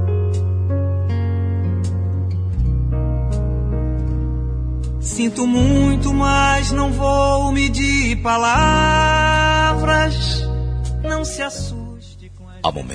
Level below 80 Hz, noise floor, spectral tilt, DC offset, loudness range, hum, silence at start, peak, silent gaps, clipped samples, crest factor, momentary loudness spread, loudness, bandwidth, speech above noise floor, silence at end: -24 dBFS; -37 dBFS; -5.5 dB/octave; under 0.1%; 6 LU; none; 0 s; -2 dBFS; none; under 0.1%; 14 dB; 9 LU; -18 LUFS; 10.5 kHz; 21 dB; 0 s